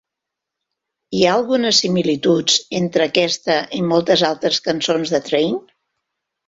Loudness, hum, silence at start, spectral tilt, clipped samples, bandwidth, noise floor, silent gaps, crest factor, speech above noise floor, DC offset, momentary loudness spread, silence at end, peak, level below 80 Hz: -17 LUFS; none; 1.1 s; -3.5 dB/octave; under 0.1%; 8 kHz; -83 dBFS; none; 18 dB; 66 dB; under 0.1%; 5 LU; 0.85 s; -2 dBFS; -58 dBFS